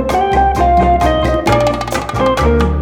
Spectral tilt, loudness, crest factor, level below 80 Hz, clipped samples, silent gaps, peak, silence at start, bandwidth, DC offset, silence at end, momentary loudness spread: -6 dB/octave; -13 LUFS; 12 dB; -20 dBFS; under 0.1%; none; 0 dBFS; 0 s; 16.5 kHz; under 0.1%; 0 s; 4 LU